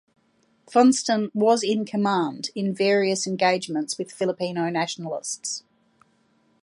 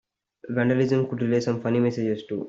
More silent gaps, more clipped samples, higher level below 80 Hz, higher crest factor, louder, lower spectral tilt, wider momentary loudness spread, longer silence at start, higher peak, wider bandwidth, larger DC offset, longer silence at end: neither; neither; second, -74 dBFS vs -64 dBFS; about the same, 20 dB vs 16 dB; about the same, -23 LUFS vs -24 LUFS; second, -4 dB/octave vs -7.5 dB/octave; first, 11 LU vs 6 LU; first, 0.7 s vs 0.45 s; first, -4 dBFS vs -10 dBFS; first, 11.5 kHz vs 7.6 kHz; neither; first, 1.05 s vs 0 s